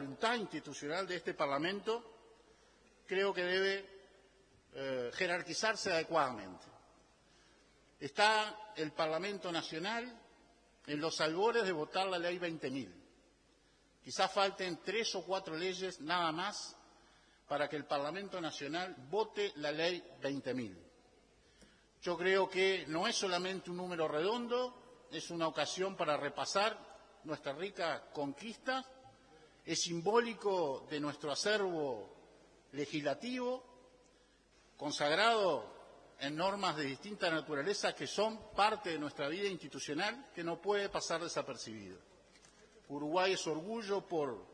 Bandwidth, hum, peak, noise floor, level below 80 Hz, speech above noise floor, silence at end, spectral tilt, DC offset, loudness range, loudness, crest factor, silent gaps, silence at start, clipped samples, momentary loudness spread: 10.5 kHz; none; -14 dBFS; -70 dBFS; -74 dBFS; 32 dB; 0 s; -3.5 dB/octave; under 0.1%; 4 LU; -37 LUFS; 24 dB; none; 0 s; under 0.1%; 11 LU